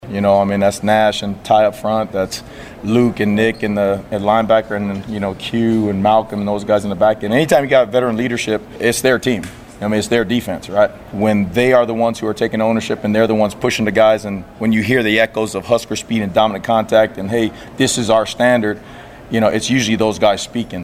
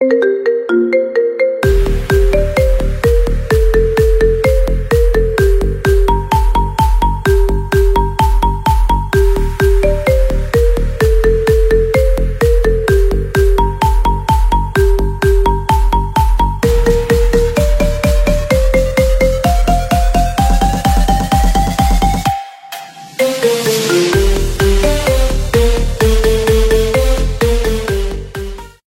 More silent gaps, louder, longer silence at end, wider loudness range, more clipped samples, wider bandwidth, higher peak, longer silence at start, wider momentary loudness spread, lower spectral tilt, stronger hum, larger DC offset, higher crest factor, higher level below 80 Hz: neither; second, -16 LUFS vs -13 LUFS; second, 0 s vs 0.2 s; about the same, 2 LU vs 1 LU; neither; about the same, 16 kHz vs 16 kHz; about the same, 0 dBFS vs 0 dBFS; about the same, 0.05 s vs 0 s; first, 8 LU vs 3 LU; about the same, -5 dB/octave vs -5.5 dB/octave; neither; neither; about the same, 16 dB vs 12 dB; second, -44 dBFS vs -14 dBFS